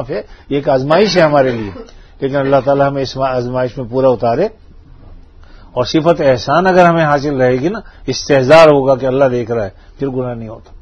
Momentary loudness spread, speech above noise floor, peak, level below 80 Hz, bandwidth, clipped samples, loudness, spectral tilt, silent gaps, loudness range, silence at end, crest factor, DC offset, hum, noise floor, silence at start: 14 LU; 25 dB; 0 dBFS; -38 dBFS; 9.2 kHz; 0.3%; -13 LUFS; -6 dB/octave; none; 5 LU; 0.05 s; 14 dB; under 0.1%; none; -38 dBFS; 0 s